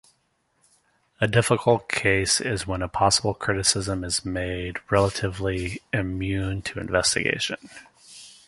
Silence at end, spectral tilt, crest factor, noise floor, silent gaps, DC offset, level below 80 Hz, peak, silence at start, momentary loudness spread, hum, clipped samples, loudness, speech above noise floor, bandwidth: 0.15 s; -3.5 dB/octave; 22 dB; -69 dBFS; none; under 0.1%; -44 dBFS; -4 dBFS; 1.2 s; 9 LU; none; under 0.1%; -24 LUFS; 45 dB; 11.5 kHz